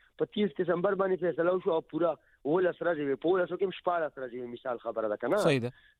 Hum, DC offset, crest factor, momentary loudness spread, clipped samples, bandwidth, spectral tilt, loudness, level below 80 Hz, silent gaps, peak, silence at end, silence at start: none; under 0.1%; 16 dB; 8 LU; under 0.1%; 13 kHz; -6.5 dB/octave; -30 LUFS; -70 dBFS; none; -14 dBFS; 0.3 s; 0.2 s